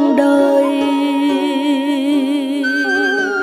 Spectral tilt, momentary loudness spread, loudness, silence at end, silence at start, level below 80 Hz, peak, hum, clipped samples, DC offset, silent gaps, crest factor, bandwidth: -3.5 dB/octave; 4 LU; -15 LUFS; 0 s; 0 s; -64 dBFS; -2 dBFS; none; under 0.1%; under 0.1%; none; 12 dB; 14.5 kHz